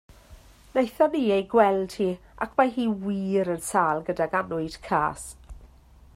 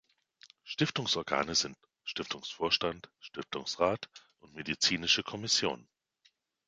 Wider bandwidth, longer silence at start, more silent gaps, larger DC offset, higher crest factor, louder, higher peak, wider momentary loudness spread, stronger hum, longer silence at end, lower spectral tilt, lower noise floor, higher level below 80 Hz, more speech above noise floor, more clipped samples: first, 16 kHz vs 9.6 kHz; second, 0.3 s vs 0.45 s; neither; neither; about the same, 20 dB vs 24 dB; first, -25 LUFS vs -31 LUFS; first, -6 dBFS vs -12 dBFS; second, 9 LU vs 16 LU; neither; second, 0.5 s vs 0.9 s; first, -5.5 dB/octave vs -2.5 dB/octave; second, -52 dBFS vs -72 dBFS; first, -52 dBFS vs -66 dBFS; second, 28 dB vs 38 dB; neither